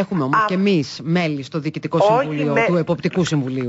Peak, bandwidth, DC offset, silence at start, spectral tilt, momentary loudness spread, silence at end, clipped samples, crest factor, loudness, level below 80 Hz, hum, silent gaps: -6 dBFS; 8 kHz; under 0.1%; 0 s; -6.5 dB/octave; 6 LU; 0 s; under 0.1%; 12 dB; -19 LUFS; -58 dBFS; none; none